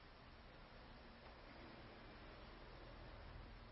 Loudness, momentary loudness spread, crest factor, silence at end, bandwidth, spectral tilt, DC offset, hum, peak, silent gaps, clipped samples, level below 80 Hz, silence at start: -60 LUFS; 3 LU; 14 dB; 0 s; 5.6 kHz; -4 dB/octave; under 0.1%; none; -44 dBFS; none; under 0.1%; -64 dBFS; 0 s